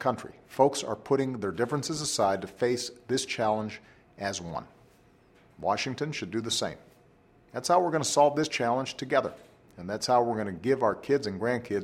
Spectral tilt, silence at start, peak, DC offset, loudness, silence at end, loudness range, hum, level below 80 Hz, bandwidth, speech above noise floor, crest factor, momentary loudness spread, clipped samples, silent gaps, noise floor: -4 dB/octave; 0 s; -8 dBFS; under 0.1%; -29 LUFS; 0 s; 6 LU; none; -64 dBFS; 16 kHz; 32 dB; 22 dB; 13 LU; under 0.1%; none; -60 dBFS